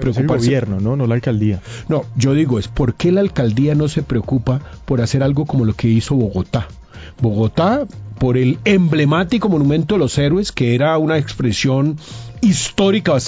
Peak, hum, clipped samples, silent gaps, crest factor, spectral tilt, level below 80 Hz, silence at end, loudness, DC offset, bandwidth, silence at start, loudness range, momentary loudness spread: -2 dBFS; none; under 0.1%; none; 14 dB; -6.5 dB/octave; -36 dBFS; 0 s; -16 LUFS; under 0.1%; 8 kHz; 0 s; 3 LU; 6 LU